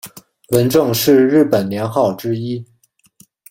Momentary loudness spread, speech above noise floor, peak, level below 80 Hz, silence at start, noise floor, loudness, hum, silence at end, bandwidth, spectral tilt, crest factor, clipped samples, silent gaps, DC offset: 13 LU; 43 dB; -2 dBFS; -52 dBFS; 0.05 s; -57 dBFS; -15 LUFS; none; 0.85 s; 17 kHz; -5.5 dB/octave; 14 dB; under 0.1%; none; under 0.1%